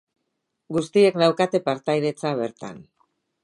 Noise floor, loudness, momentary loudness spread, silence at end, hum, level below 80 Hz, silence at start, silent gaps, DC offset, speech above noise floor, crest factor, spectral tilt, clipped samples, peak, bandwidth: -78 dBFS; -22 LUFS; 13 LU; 0.6 s; none; -70 dBFS; 0.7 s; none; under 0.1%; 56 dB; 18 dB; -6 dB/octave; under 0.1%; -4 dBFS; 11.5 kHz